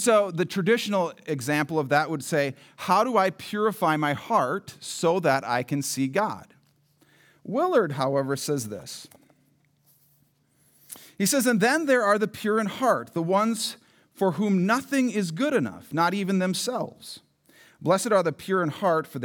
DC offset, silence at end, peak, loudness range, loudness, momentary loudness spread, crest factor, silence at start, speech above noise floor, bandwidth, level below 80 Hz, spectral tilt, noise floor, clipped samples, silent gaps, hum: under 0.1%; 0 s; -8 dBFS; 5 LU; -25 LUFS; 11 LU; 18 dB; 0 s; 41 dB; over 20 kHz; -76 dBFS; -4.5 dB/octave; -65 dBFS; under 0.1%; none; none